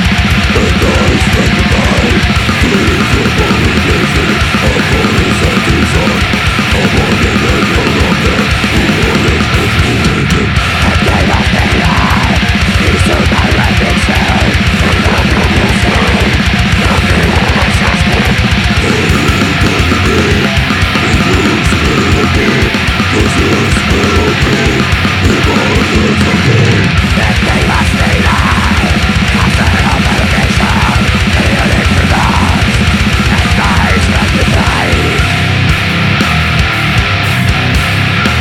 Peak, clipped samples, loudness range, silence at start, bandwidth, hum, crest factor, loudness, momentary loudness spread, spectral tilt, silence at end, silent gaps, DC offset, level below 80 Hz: 0 dBFS; under 0.1%; 0 LU; 0 s; 16.5 kHz; none; 8 dB; -9 LUFS; 1 LU; -5 dB/octave; 0 s; none; under 0.1%; -18 dBFS